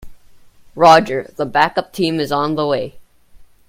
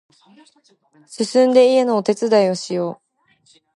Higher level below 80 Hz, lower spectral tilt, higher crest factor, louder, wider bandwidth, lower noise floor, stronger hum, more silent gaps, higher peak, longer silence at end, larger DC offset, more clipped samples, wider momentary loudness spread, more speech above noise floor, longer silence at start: first, -48 dBFS vs -74 dBFS; about the same, -5 dB/octave vs -5 dB/octave; about the same, 18 dB vs 16 dB; about the same, -15 LUFS vs -17 LUFS; first, 16.5 kHz vs 11.5 kHz; second, -44 dBFS vs -58 dBFS; neither; neither; about the same, 0 dBFS vs -2 dBFS; second, 0.25 s vs 0.85 s; neither; neither; about the same, 12 LU vs 12 LU; second, 29 dB vs 40 dB; second, 0 s vs 1.1 s